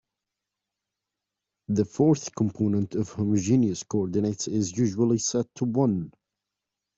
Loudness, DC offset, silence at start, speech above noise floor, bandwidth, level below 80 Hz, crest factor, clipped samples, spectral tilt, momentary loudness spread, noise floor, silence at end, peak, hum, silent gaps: -26 LUFS; under 0.1%; 1.7 s; 62 dB; 8 kHz; -64 dBFS; 16 dB; under 0.1%; -6.5 dB/octave; 6 LU; -86 dBFS; 0.9 s; -10 dBFS; 50 Hz at -45 dBFS; none